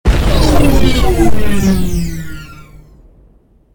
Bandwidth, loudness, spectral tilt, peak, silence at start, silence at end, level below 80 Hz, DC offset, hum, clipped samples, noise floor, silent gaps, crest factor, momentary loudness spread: 19.5 kHz; -13 LUFS; -6 dB/octave; 0 dBFS; 0.05 s; 0 s; -16 dBFS; under 0.1%; none; 0.2%; -47 dBFS; none; 12 dB; 17 LU